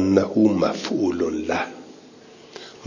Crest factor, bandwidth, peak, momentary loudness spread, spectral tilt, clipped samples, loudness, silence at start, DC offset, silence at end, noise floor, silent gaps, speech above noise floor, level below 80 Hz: 20 dB; 7.4 kHz; -2 dBFS; 22 LU; -6 dB/octave; under 0.1%; -22 LUFS; 0 s; under 0.1%; 0 s; -46 dBFS; none; 25 dB; -50 dBFS